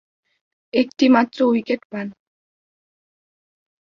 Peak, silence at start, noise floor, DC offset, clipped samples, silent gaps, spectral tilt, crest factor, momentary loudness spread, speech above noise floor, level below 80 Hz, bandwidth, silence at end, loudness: -2 dBFS; 0.75 s; under -90 dBFS; under 0.1%; under 0.1%; 1.85-1.90 s; -5.5 dB/octave; 20 dB; 15 LU; over 72 dB; -66 dBFS; 6.8 kHz; 1.9 s; -19 LUFS